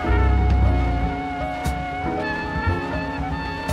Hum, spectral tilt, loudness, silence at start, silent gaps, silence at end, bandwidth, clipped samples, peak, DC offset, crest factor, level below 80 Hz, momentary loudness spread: none; -7 dB/octave; -23 LUFS; 0 s; none; 0 s; 11.5 kHz; under 0.1%; -10 dBFS; under 0.1%; 12 dB; -24 dBFS; 8 LU